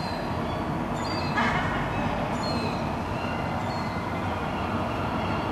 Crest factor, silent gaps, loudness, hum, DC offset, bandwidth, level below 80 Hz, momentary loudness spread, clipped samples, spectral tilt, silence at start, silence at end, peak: 16 dB; none; -28 LUFS; none; under 0.1%; 13 kHz; -42 dBFS; 5 LU; under 0.1%; -6 dB/octave; 0 s; 0 s; -12 dBFS